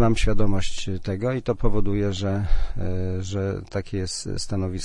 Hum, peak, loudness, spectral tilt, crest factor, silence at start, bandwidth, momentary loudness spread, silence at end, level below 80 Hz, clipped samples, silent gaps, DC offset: none; -6 dBFS; -27 LUFS; -6 dB/octave; 14 dB; 0 s; 10.5 kHz; 6 LU; 0 s; -28 dBFS; under 0.1%; none; under 0.1%